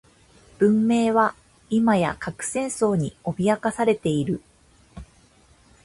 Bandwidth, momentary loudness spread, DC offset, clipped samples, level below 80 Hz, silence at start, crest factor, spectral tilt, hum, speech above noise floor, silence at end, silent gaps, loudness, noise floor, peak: 11.5 kHz; 8 LU; under 0.1%; under 0.1%; -54 dBFS; 0.6 s; 18 dB; -6 dB/octave; none; 34 dB; 0.8 s; none; -23 LUFS; -56 dBFS; -6 dBFS